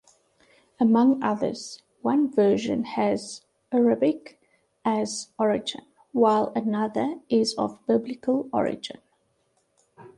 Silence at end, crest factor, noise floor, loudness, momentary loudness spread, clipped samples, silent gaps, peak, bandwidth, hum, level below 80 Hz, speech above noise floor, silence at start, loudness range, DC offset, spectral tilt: 0.1 s; 18 dB; -70 dBFS; -25 LUFS; 13 LU; under 0.1%; none; -8 dBFS; 11.5 kHz; none; -66 dBFS; 46 dB; 0.8 s; 3 LU; under 0.1%; -5.5 dB/octave